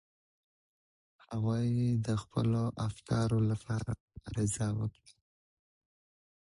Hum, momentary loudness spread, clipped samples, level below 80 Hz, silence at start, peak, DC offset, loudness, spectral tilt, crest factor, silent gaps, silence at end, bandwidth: none; 10 LU; under 0.1%; -56 dBFS; 1.3 s; -18 dBFS; under 0.1%; -34 LUFS; -7 dB/octave; 16 dB; 4.00-4.08 s; 1.65 s; 11.5 kHz